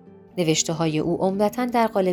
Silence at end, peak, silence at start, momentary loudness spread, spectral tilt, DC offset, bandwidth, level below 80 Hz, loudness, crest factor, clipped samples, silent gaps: 0 s; -4 dBFS; 0.1 s; 3 LU; -4.5 dB/octave; under 0.1%; 19.5 kHz; -56 dBFS; -22 LUFS; 18 dB; under 0.1%; none